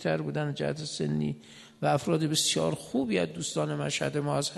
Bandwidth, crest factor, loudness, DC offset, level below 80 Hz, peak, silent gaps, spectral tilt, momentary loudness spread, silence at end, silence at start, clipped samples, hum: 12 kHz; 16 dB; -29 LUFS; under 0.1%; -62 dBFS; -12 dBFS; none; -4.5 dB/octave; 7 LU; 0 s; 0 s; under 0.1%; none